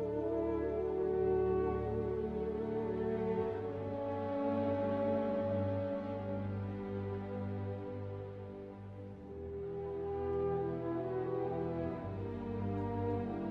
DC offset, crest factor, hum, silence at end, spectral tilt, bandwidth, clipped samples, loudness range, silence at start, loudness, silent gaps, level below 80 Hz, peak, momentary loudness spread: under 0.1%; 14 dB; none; 0 s; -10.5 dB/octave; 5.4 kHz; under 0.1%; 7 LU; 0 s; -38 LUFS; none; -54 dBFS; -22 dBFS; 9 LU